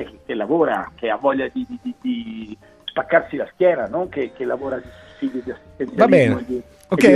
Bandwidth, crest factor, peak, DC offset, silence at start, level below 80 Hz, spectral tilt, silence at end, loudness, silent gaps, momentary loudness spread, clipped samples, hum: 14.5 kHz; 20 dB; 0 dBFS; under 0.1%; 0 s; -52 dBFS; -6.5 dB/octave; 0 s; -21 LUFS; none; 15 LU; under 0.1%; none